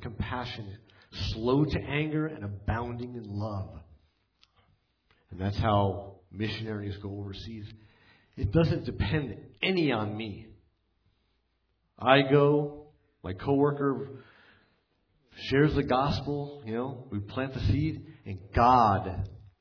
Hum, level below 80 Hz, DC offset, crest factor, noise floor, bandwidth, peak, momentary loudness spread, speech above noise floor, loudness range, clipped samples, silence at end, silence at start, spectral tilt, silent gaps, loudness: none; -46 dBFS; under 0.1%; 24 dB; -75 dBFS; 5.4 kHz; -6 dBFS; 18 LU; 46 dB; 6 LU; under 0.1%; 0.25 s; 0 s; -8 dB/octave; none; -29 LUFS